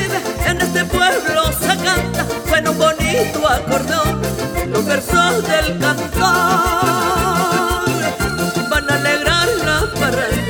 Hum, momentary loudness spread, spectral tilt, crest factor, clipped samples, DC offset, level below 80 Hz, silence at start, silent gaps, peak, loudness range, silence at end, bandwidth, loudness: none; 5 LU; -4 dB/octave; 16 dB; under 0.1%; under 0.1%; -30 dBFS; 0 s; none; 0 dBFS; 1 LU; 0 s; over 20 kHz; -16 LUFS